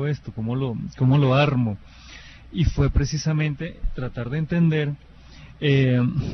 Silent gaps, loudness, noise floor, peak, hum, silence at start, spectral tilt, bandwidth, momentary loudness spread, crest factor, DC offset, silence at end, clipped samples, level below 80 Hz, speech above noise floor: none; -23 LUFS; -44 dBFS; -6 dBFS; none; 0 s; -7 dB/octave; 6.4 kHz; 16 LU; 16 dB; under 0.1%; 0 s; under 0.1%; -34 dBFS; 23 dB